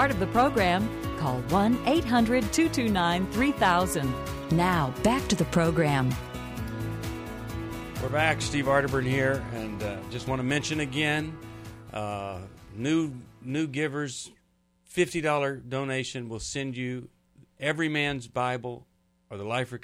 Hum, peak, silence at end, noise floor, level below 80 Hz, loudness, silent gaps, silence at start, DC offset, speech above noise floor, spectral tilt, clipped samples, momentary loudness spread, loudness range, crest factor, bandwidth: none; -10 dBFS; 0.05 s; -67 dBFS; -46 dBFS; -27 LUFS; none; 0 s; under 0.1%; 41 dB; -5 dB/octave; under 0.1%; 12 LU; 7 LU; 18 dB; 16 kHz